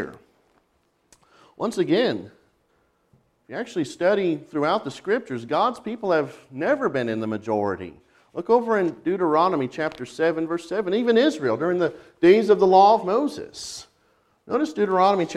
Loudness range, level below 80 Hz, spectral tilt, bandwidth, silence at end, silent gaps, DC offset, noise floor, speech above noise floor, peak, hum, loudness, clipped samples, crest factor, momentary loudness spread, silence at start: 8 LU; -64 dBFS; -5.5 dB/octave; 12 kHz; 0 s; none; under 0.1%; -67 dBFS; 46 dB; -4 dBFS; none; -22 LUFS; under 0.1%; 20 dB; 16 LU; 0 s